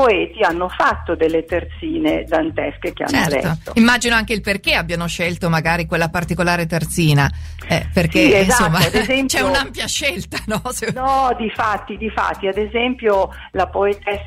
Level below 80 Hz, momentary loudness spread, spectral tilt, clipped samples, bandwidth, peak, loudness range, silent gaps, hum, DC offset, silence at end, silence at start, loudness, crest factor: -34 dBFS; 9 LU; -4.5 dB/octave; under 0.1%; 16 kHz; 0 dBFS; 4 LU; none; none; under 0.1%; 0 s; 0 s; -17 LUFS; 18 dB